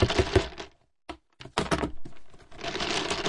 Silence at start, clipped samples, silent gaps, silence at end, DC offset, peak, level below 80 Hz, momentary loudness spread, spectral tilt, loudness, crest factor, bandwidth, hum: 0 s; under 0.1%; none; 0 s; under 0.1%; -8 dBFS; -42 dBFS; 20 LU; -4.5 dB/octave; -29 LUFS; 22 dB; 11.5 kHz; none